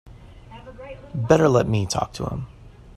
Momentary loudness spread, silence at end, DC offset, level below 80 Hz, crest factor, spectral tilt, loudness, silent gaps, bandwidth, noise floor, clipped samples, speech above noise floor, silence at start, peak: 24 LU; 0.05 s; under 0.1%; -44 dBFS; 22 dB; -6 dB/octave; -21 LUFS; none; 14 kHz; -43 dBFS; under 0.1%; 22 dB; 0.05 s; -2 dBFS